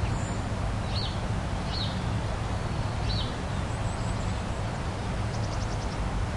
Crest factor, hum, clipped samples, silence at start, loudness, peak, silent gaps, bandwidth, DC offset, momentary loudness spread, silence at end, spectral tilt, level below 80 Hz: 12 dB; none; under 0.1%; 0 s; -31 LUFS; -18 dBFS; none; 11.5 kHz; under 0.1%; 2 LU; 0 s; -5.5 dB/octave; -36 dBFS